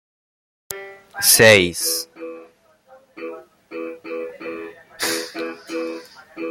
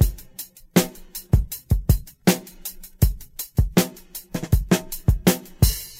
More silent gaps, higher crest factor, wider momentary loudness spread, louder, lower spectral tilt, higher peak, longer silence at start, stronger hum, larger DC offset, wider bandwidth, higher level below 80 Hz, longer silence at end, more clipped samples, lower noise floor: neither; about the same, 22 dB vs 22 dB; first, 25 LU vs 14 LU; first, -16 LUFS vs -23 LUFS; second, -2 dB/octave vs -5.5 dB/octave; about the same, 0 dBFS vs 0 dBFS; first, 0.7 s vs 0 s; neither; neither; about the same, 16.5 kHz vs 16.5 kHz; second, -60 dBFS vs -28 dBFS; about the same, 0 s vs 0.05 s; neither; first, -52 dBFS vs -41 dBFS